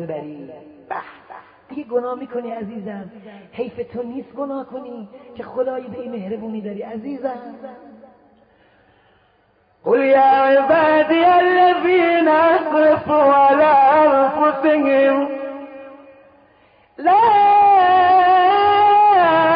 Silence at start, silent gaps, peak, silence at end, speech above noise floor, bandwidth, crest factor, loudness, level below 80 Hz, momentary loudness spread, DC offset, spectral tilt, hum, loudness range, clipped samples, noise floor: 0 s; none; -4 dBFS; 0 s; 42 dB; 5.2 kHz; 12 dB; -14 LUFS; -58 dBFS; 20 LU; under 0.1%; -10 dB/octave; none; 16 LU; under 0.1%; -58 dBFS